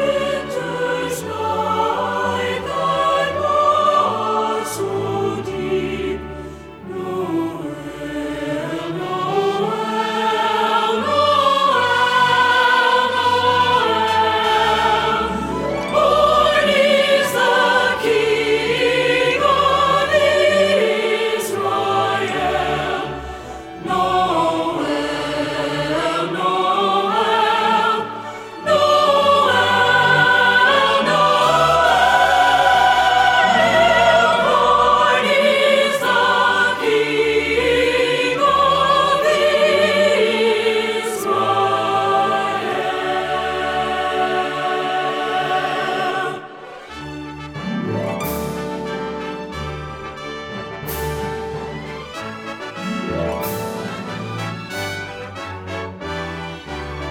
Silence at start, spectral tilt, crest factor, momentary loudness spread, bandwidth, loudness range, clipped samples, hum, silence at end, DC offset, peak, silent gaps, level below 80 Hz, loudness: 0 s; -4 dB/octave; 16 dB; 15 LU; 18.5 kHz; 12 LU; under 0.1%; none; 0 s; under 0.1%; -2 dBFS; none; -44 dBFS; -17 LUFS